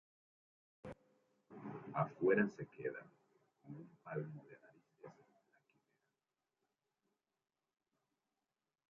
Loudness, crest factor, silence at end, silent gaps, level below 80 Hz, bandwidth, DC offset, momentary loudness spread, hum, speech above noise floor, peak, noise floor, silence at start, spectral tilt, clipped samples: -41 LUFS; 26 dB; 3.8 s; none; -82 dBFS; 7 kHz; under 0.1%; 26 LU; none; over 49 dB; -20 dBFS; under -90 dBFS; 0.85 s; -8 dB/octave; under 0.1%